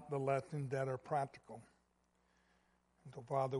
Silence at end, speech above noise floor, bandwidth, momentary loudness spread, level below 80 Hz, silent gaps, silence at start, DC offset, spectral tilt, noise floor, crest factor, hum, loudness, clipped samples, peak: 0 s; 38 dB; 11.5 kHz; 18 LU; -78 dBFS; none; 0 s; under 0.1%; -7.5 dB/octave; -78 dBFS; 20 dB; none; -41 LUFS; under 0.1%; -24 dBFS